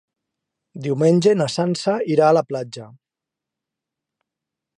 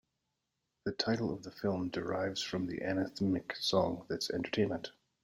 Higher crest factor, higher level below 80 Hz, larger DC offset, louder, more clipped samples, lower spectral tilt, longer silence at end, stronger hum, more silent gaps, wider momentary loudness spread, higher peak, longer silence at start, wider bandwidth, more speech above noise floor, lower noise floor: about the same, 18 dB vs 20 dB; about the same, -70 dBFS vs -66 dBFS; neither; first, -18 LUFS vs -35 LUFS; neither; first, -6.5 dB/octave vs -5 dB/octave; first, 1.9 s vs 0.3 s; neither; neither; first, 15 LU vs 6 LU; first, -4 dBFS vs -16 dBFS; about the same, 0.75 s vs 0.85 s; second, 11.5 kHz vs 16.5 kHz; first, 68 dB vs 50 dB; about the same, -86 dBFS vs -85 dBFS